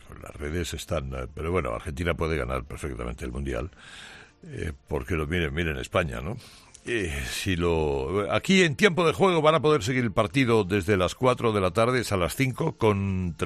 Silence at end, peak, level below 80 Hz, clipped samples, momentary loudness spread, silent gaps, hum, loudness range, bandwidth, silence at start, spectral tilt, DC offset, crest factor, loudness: 0 s; -4 dBFS; -42 dBFS; under 0.1%; 15 LU; none; none; 10 LU; 14 kHz; 0.05 s; -5.5 dB/octave; under 0.1%; 20 dB; -26 LUFS